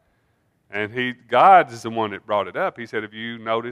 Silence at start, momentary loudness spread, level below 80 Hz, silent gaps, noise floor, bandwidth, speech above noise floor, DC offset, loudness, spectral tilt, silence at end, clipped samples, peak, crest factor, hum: 0.7 s; 17 LU; -70 dBFS; none; -66 dBFS; 11 kHz; 46 dB; under 0.1%; -20 LUFS; -5 dB/octave; 0 s; under 0.1%; 0 dBFS; 20 dB; none